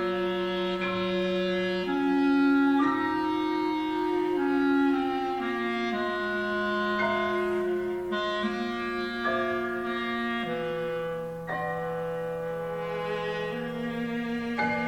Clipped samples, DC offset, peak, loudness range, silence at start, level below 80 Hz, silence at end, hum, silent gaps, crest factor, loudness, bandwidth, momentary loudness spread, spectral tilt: under 0.1%; under 0.1%; -14 dBFS; 6 LU; 0 s; -58 dBFS; 0 s; none; none; 14 dB; -28 LUFS; 16 kHz; 8 LU; -6.5 dB/octave